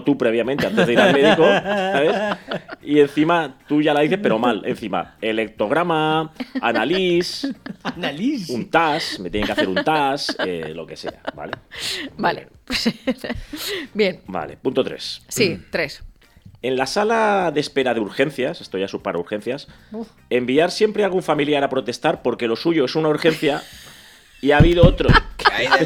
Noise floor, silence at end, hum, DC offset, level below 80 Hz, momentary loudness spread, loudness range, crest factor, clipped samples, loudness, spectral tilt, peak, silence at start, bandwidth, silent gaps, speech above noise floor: -47 dBFS; 0 s; none; under 0.1%; -34 dBFS; 14 LU; 7 LU; 18 dB; under 0.1%; -20 LUFS; -5.5 dB/octave; -2 dBFS; 0 s; 17 kHz; none; 28 dB